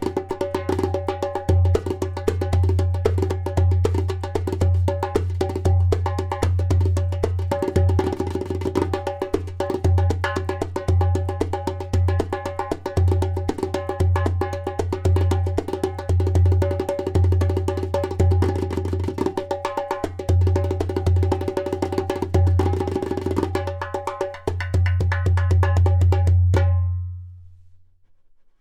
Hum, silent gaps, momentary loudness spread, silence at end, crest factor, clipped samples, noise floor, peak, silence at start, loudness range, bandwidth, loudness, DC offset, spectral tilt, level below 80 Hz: none; none; 8 LU; 0.85 s; 14 dB; under 0.1%; -53 dBFS; -6 dBFS; 0 s; 3 LU; 10.5 kHz; -22 LUFS; under 0.1%; -8 dB/octave; -34 dBFS